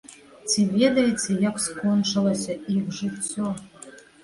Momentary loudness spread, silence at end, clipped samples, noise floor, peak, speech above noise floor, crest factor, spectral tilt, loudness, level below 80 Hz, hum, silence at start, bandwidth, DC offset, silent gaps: 16 LU; 0.25 s; under 0.1%; -46 dBFS; -6 dBFS; 23 dB; 18 dB; -4.5 dB/octave; -24 LUFS; -60 dBFS; none; 0.1 s; 11.5 kHz; under 0.1%; none